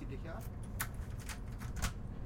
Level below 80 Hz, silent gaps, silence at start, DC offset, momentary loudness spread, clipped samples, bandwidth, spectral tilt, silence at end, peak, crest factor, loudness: -46 dBFS; none; 0 s; under 0.1%; 5 LU; under 0.1%; 16.5 kHz; -4.5 dB/octave; 0 s; -20 dBFS; 22 dB; -43 LUFS